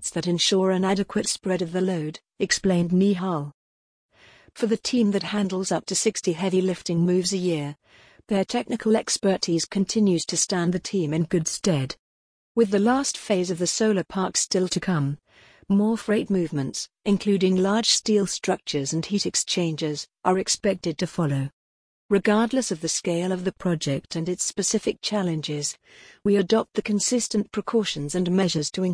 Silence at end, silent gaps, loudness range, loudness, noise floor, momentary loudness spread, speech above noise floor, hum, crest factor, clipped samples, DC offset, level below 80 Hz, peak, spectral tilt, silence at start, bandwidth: 0 s; 3.54-4.09 s, 11.99-12.55 s, 21.53-22.09 s; 2 LU; -24 LUFS; under -90 dBFS; 7 LU; over 66 dB; none; 20 dB; under 0.1%; under 0.1%; -58 dBFS; -4 dBFS; -4.5 dB/octave; 0 s; 10.5 kHz